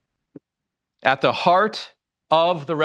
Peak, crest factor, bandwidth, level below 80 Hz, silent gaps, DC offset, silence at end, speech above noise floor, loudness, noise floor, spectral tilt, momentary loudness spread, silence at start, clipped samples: -2 dBFS; 20 dB; 9.6 kHz; -70 dBFS; none; under 0.1%; 0 s; 65 dB; -20 LUFS; -84 dBFS; -5.5 dB/octave; 10 LU; 1.05 s; under 0.1%